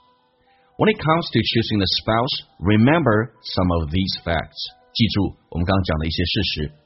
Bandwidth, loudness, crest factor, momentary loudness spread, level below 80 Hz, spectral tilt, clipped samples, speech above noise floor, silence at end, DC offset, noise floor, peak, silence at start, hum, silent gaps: 6 kHz; -20 LUFS; 20 dB; 8 LU; -38 dBFS; -4.5 dB/octave; under 0.1%; 39 dB; 0.15 s; under 0.1%; -59 dBFS; -2 dBFS; 0.8 s; none; none